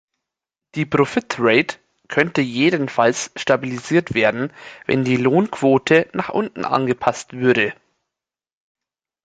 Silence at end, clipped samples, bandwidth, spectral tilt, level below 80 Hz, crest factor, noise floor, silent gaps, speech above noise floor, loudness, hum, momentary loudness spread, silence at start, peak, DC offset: 1.5 s; under 0.1%; 9.4 kHz; -5.5 dB/octave; -58 dBFS; 18 dB; -86 dBFS; none; 67 dB; -19 LUFS; none; 7 LU; 0.75 s; -2 dBFS; under 0.1%